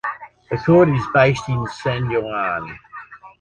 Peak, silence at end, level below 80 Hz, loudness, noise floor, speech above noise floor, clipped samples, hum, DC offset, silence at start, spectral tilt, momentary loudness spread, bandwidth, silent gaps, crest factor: -2 dBFS; 0.1 s; -46 dBFS; -19 LUFS; -39 dBFS; 21 dB; under 0.1%; none; under 0.1%; 0.05 s; -7.5 dB/octave; 22 LU; 9.8 kHz; none; 18 dB